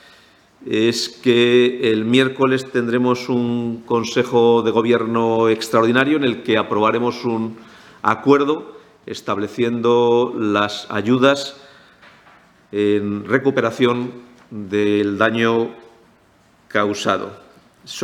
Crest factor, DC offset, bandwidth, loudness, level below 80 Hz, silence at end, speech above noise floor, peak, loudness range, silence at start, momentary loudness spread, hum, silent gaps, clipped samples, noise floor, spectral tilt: 18 dB; under 0.1%; 14.5 kHz; -18 LUFS; -64 dBFS; 0 s; 37 dB; 0 dBFS; 4 LU; 0.6 s; 10 LU; none; none; under 0.1%; -54 dBFS; -5.5 dB/octave